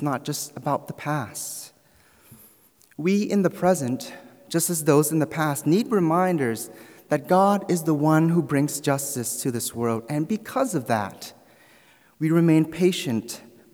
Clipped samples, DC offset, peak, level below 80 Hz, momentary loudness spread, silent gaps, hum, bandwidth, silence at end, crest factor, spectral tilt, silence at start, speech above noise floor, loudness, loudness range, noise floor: under 0.1%; under 0.1%; -6 dBFS; -68 dBFS; 12 LU; none; none; over 20 kHz; 0.35 s; 18 dB; -5.5 dB/octave; 0 s; 35 dB; -23 LUFS; 5 LU; -58 dBFS